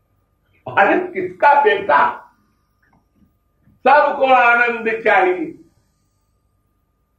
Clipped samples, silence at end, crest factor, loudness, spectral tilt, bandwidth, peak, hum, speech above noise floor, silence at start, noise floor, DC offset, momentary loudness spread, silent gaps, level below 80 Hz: under 0.1%; 1.65 s; 16 dB; -15 LUFS; -5.5 dB/octave; 8.4 kHz; -2 dBFS; none; 50 dB; 0.65 s; -65 dBFS; under 0.1%; 13 LU; none; -62 dBFS